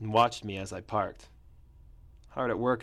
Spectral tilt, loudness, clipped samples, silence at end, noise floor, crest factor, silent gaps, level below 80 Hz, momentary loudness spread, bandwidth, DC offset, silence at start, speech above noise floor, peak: -5.5 dB/octave; -31 LUFS; under 0.1%; 0 s; -55 dBFS; 20 dB; none; -56 dBFS; 14 LU; 15 kHz; under 0.1%; 0 s; 25 dB; -12 dBFS